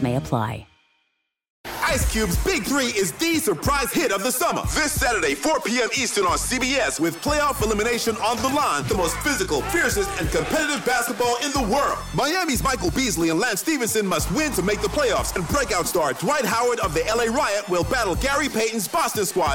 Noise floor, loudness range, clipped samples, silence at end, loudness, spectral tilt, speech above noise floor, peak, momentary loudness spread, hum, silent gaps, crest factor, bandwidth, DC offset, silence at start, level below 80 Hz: -73 dBFS; 1 LU; under 0.1%; 0 s; -22 LUFS; -3.5 dB/octave; 51 dB; -6 dBFS; 2 LU; none; 1.50-1.64 s; 16 dB; 17 kHz; under 0.1%; 0 s; -36 dBFS